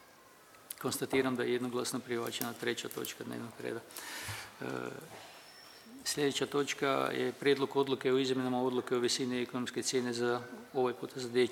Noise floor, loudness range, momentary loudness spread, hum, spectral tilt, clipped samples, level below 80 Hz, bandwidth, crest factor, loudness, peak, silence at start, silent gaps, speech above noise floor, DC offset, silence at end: -59 dBFS; 8 LU; 12 LU; none; -3.5 dB/octave; under 0.1%; -76 dBFS; 19 kHz; 18 dB; -35 LUFS; -16 dBFS; 0 s; none; 25 dB; under 0.1%; 0 s